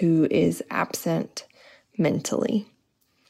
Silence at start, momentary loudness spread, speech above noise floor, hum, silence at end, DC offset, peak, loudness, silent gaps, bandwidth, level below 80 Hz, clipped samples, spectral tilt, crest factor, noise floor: 0 s; 13 LU; 45 dB; none; 0.65 s; under 0.1%; -10 dBFS; -25 LUFS; none; 16 kHz; -64 dBFS; under 0.1%; -6 dB/octave; 16 dB; -68 dBFS